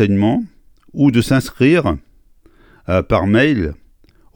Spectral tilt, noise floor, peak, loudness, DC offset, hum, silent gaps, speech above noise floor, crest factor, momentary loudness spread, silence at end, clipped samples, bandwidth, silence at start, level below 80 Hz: -7 dB/octave; -49 dBFS; 0 dBFS; -15 LUFS; under 0.1%; none; none; 35 dB; 16 dB; 14 LU; 0.6 s; under 0.1%; 18.5 kHz; 0 s; -36 dBFS